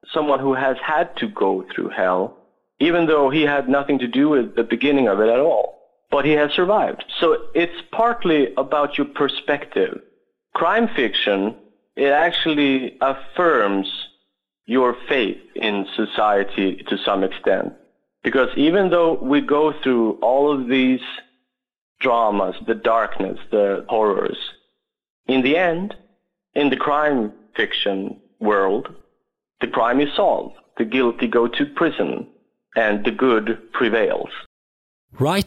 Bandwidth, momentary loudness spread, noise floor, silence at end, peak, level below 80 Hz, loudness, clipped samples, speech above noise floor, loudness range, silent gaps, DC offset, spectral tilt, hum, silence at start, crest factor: 13 kHz; 10 LU; -72 dBFS; 0 s; -6 dBFS; -56 dBFS; -19 LUFS; under 0.1%; 54 dB; 3 LU; 21.78-21.96 s, 25.10-25.24 s, 34.46-35.08 s; under 0.1%; -6 dB/octave; none; 0.1 s; 12 dB